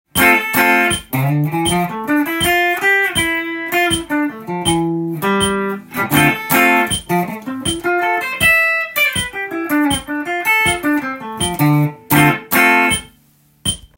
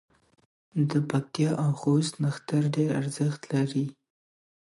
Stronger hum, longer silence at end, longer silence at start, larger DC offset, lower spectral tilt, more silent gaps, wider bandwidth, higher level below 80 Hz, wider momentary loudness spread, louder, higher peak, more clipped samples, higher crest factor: neither; second, 0.15 s vs 0.8 s; second, 0.15 s vs 0.75 s; neither; second, -4 dB/octave vs -7 dB/octave; neither; first, 17 kHz vs 11.5 kHz; first, -42 dBFS vs -70 dBFS; first, 9 LU vs 5 LU; first, -15 LUFS vs -28 LUFS; first, 0 dBFS vs -12 dBFS; neither; about the same, 16 dB vs 16 dB